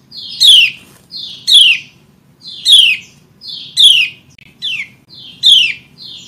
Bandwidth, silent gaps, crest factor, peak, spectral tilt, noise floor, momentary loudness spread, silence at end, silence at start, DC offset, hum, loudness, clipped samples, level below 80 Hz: 16.5 kHz; none; 12 dB; 0 dBFS; 2.5 dB/octave; -47 dBFS; 22 LU; 0.1 s; 0.15 s; under 0.1%; none; -7 LUFS; 0.2%; -60 dBFS